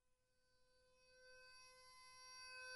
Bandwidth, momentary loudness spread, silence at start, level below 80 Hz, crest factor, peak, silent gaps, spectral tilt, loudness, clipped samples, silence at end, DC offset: 11.5 kHz; 10 LU; 0.05 s; -86 dBFS; 18 dB; -46 dBFS; none; 1 dB/octave; -61 LUFS; under 0.1%; 0 s; under 0.1%